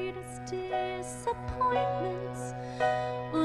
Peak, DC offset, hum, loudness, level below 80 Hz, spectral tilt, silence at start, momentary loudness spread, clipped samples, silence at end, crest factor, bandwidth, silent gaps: -16 dBFS; under 0.1%; none; -33 LUFS; -52 dBFS; -5.5 dB/octave; 0 s; 9 LU; under 0.1%; 0 s; 16 dB; 13 kHz; none